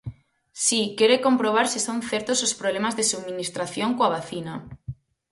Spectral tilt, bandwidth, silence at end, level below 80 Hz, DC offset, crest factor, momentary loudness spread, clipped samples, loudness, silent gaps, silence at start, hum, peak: -2.5 dB/octave; 12 kHz; 0.4 s; -58 dBFS; under 0.1%; 20 dB; 18 LU; under 0.1%; -23 LUFS; none; 0.05 s; none; -6 dBFS